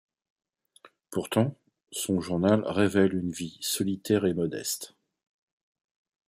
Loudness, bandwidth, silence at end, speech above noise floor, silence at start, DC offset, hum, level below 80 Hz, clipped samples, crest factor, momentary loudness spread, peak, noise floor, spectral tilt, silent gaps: -28 LUFS; 15.5 kHz; 1.45 s; 32 dB; 0.85 s; under 0.1%; none; -66 dBFS; under 0.1%; 20 dB; 11 LU; -8 dBFS; -59 dBFS; -5 dB/octave; none